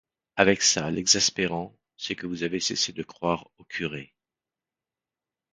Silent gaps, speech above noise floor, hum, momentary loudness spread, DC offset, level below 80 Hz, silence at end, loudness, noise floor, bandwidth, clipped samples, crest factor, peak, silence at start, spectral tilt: none; over 64 dB; none; 17 LU; under 0.1%; -58 dBFS; 1.45 s; -25 LUFS; under -90 dBFS; 11 kHz; under 0.1%; 28 dB; -2 dBFS; 0.35 s; -2 dB/octave